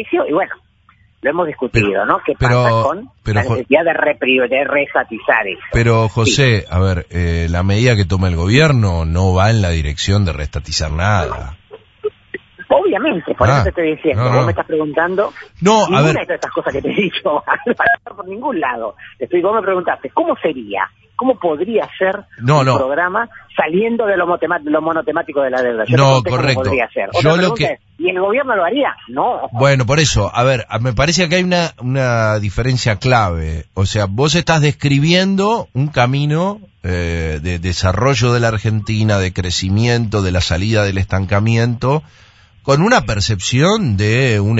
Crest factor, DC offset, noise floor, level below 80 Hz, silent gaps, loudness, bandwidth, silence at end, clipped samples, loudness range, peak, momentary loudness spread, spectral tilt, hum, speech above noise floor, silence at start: 14 dB; under 0.1%; -52 dBFS; -32 dBFS; none; -15 LUFS; 8 kHz; 0 s; under 0.1%; 3 LU; 0 dBFS; 7 LU; -5.5 dB/octave; none; 37 dB; 0 s